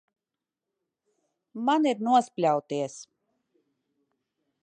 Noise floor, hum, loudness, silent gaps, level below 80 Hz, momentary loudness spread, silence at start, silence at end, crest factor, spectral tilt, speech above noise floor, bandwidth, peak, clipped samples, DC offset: -89 dBFS; none; -26 LUFS; none; -86 dBFS; 16 LU; 1.55 s; 1.6 s; 20 dB; -5 dB/octave; 64 dB; 9.8 kHz; -10 dBFS; under 0.1%; under 0.1%